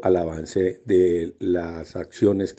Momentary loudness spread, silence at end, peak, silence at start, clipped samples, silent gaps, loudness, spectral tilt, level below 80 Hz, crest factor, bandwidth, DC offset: 12 LU; 0.05 s; -6 dBFS; 0 s; under 0.1%; none; -23 LUFS; -7.5 dB/octave; -50 dBFS; 16 dB; 8.4 kHz; under 0.1%